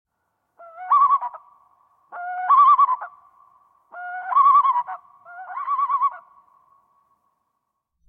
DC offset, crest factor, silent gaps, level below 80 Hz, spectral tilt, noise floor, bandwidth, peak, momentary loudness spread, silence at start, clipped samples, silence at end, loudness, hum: under 0.1%; 16 dB; none; -82 dBFS; -2.5 dB/octave; -77 dBFS; 3.7 kHz; -6 dBFS; 23 LU; 0.6 s; under 0.1%; 1.9 s; -18 LUFS; none